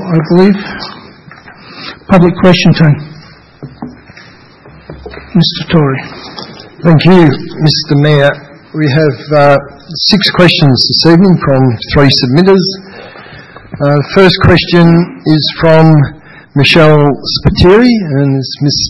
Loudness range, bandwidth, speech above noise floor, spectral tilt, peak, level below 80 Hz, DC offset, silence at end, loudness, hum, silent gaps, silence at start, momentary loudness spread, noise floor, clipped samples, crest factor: 6 LU; 10.5 kHz; 29 dB; -6.5 dB/octave; 0 dBFS; -32 dBFS; under 0.1%; 0 s; -8 LUFS; none; none; 0 s; 20 LU; -36 dBFS; 2%; 8 dB